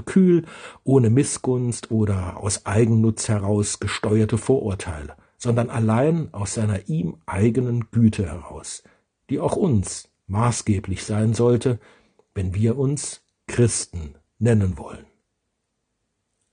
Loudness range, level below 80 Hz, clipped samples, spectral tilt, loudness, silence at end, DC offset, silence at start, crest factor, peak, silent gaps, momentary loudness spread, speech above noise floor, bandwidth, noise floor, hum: 3 LU; -48 dBFS; under 0.1%; -6.5 dB/octave; -22 LUFS; 1.5 s; under 0.1%; 0 s; 18 dB; -4 dBFS; none; 14 LU; 55 dB; 10 kHz; -76 dBFS; none